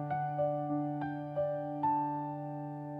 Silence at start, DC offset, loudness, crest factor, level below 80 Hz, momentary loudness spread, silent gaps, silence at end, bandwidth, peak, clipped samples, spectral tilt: 0 s; under 0.1%; -35 LUFS; 12 dB; -74 dBFS; 8 LU; none; 0 s; 4.8 kHz; -22 dBFS; under 0.1%; -10.5 dB/octave